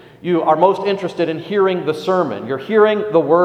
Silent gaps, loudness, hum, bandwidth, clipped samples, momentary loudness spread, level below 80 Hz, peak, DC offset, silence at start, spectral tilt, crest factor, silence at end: none; -17 LUFS; none; 9.8 kHz; under 0.1%; 7 LU; -62 dBFS; 0 dBFS; under 0.1%; 0.25 s; -7 dB/octave; 16 dB; 0 s